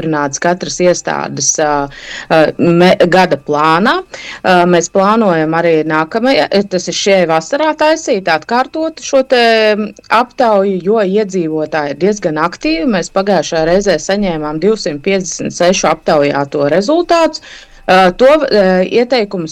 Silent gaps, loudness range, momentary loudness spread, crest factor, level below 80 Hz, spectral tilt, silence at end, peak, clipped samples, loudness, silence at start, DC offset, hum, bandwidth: none; 3 LU; 7 LU; 10 dB; -42 dBFS; -4.5 dB/octave; 0 s; 0 dBFS; under 0.1%; -12 LUFS; 0 s; under 0.1%; none; 12.5 kHz